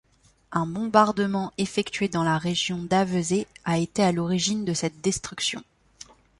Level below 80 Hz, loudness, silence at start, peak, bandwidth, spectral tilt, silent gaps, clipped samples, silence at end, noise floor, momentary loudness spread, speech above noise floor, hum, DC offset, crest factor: -56 dBFS; -25 LUFS; 0.5 s; -4 dBFS; 11.5 kHz; -4.5 dB/octave; none; under 0.1%; 0.75 s; -50 dBFS; 6 LU; 26 dB; none; under 0.1%; 22 dB